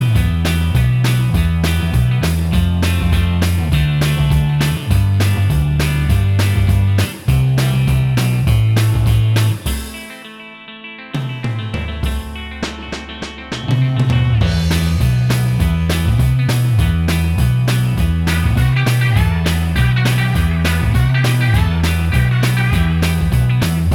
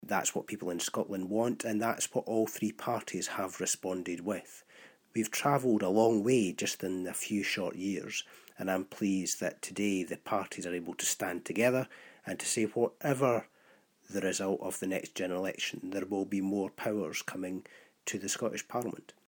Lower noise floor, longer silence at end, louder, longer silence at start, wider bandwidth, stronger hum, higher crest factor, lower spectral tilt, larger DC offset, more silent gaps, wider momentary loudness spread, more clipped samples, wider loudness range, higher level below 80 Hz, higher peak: second, -34 dBFS vs -65 dBFS; second, 0 s vs 0.15 s; first, -15 LUFS vs -33 LUFS; about the same, 0 s vs 0 s; about the same, 17.5 kHz vs 17.5 kHz; neither; second, 12 dB vs 20 dB; first, -6 dB/octave vs -4 dB/octave; neither; neither; about the same, 10 LU vs 9 LU; neither; about the same, 6 LU vs 5 LU; first, -22 dBFS vs -80 dBFS; first, -2 dBFS vs -14 dBFS